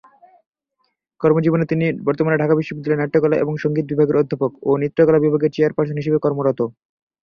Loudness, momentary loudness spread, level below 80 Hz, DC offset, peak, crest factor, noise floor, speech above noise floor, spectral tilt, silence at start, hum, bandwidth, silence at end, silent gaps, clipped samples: -18 LUFS; 6 LU; -58 dBFS; under 0.1%; -2 dBFS; 16 dB; -70 dBFS; 53 dB; -9.5 dB/octave; 1.2 s; none; 6.4 kHz; 0.5 s; none; under 0.1%